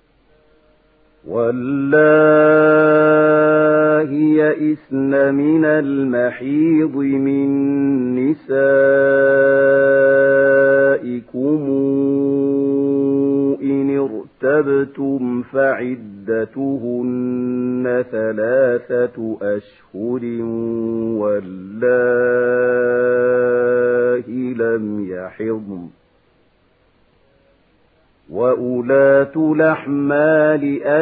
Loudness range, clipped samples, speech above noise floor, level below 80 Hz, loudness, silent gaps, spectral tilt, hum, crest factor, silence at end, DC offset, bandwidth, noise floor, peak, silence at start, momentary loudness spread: 8 LU; under 0.1%; 41 dB; -60 dBFS; -16 LUFS; none; -12.5 dB/octave; none; 14 dB; 0 s; under 0.1%; 4 kHz; -57 dBFS; -2 dBFS; 1.25 s; 11 LU